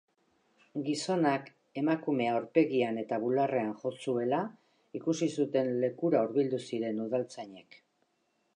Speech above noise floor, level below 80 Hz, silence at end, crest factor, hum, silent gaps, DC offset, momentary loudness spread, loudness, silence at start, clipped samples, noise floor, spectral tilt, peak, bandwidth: 45 dB; -86 dBFS; 0.95 s; 20 dB; none; none; under 0.1%; 10 LU; -31 LUFS; 0.75 s; under 0.1%; -76 dBFS; -6 dB/octave; -12 dBFS; 10.5 kHz